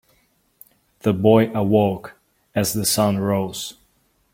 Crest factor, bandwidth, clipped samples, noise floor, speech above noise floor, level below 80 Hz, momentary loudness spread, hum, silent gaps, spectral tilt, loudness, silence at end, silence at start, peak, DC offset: 20 dB; 16.5 kHz; under 0.1%; -63 dBFS; 45 dB; -54 dBFS; 13 LU; none; none; -5 dB/octave; -20 LUFS; 0.6 s; 1.05 s; -2 dBFS; under 0.1%